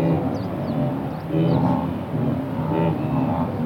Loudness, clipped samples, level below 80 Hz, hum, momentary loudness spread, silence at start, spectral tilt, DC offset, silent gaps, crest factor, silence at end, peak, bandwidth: -23 LUFS; under 0.1%; -46 dBFS; none; 6 LU; 0 s; -9.5 dB/octave; under 0.1%; none; 12 dB; 0 s; -8 dBFS; 16.5 kHz